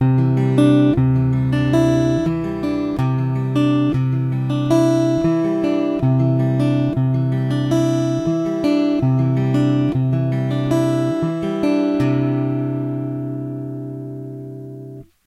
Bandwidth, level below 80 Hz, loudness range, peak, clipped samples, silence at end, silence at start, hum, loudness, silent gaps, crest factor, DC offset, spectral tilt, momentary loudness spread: 10.5 kHz; -44 dBFS; 4 LU; -4 dBFS; under 0.1%; 0.25 s; 0 s; none; -18 LUFS; none; 14 dB; under 0.1%; -8.5 dB/octave; 11 LU